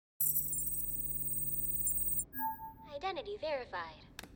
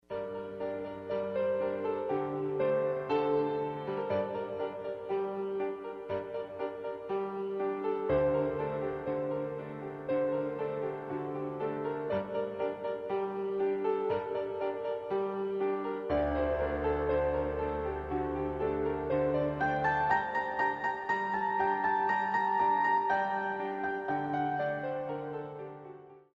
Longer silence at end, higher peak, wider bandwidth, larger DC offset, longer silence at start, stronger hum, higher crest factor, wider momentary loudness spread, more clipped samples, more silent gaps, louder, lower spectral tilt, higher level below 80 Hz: second, 0 s vs 0.15 s; second, -20 dBFS vs -16 dBFS; first, 17 kHz vs 7.2 kHz; neither; about the same, 0.2 s vs 0.1 s; neither; about the same, 18 dB vs 16 dB; first, 13 LU vs 9 LU; neither; neither; about the same, -34 LUFS vs -33 LUFS; second, -2 dB/octave vs -8 dB/octave; about the same, -56 dBFS vs -54 dBFS